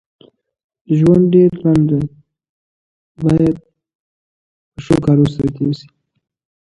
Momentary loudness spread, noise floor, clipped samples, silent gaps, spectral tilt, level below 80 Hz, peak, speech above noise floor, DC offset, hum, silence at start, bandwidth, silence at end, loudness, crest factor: 14 LU; under -90 dBFS; under 0.1%; 2.49-3.15 s, 3.95-4.72 s; -9 dB/octave; -42 dBFS; 0 dBFS; over 77 dB; under 0.1%; none; 0.9 s; 11 kHz; 0.9 s; -14 LUFS; 16 dB